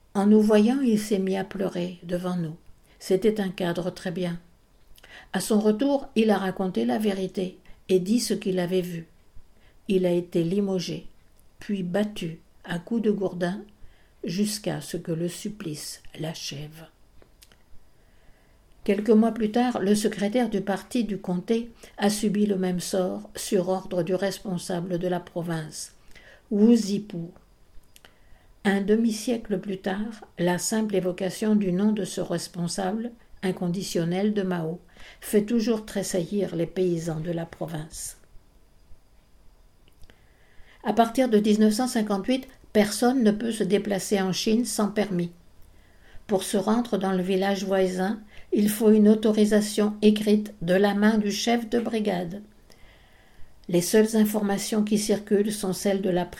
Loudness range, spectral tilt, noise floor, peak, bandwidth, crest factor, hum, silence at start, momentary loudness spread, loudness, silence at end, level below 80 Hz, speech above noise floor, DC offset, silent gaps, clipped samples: 8 LU; -5.5 dB/octave; -56 dBFS; -6 dBFS; 17 kHz; 20 dB; none; 0.15 s; 13 LU; -25 LUFS; 0 s; -54 dBFS; 32 dB; under 0.1%; none; under 0.1%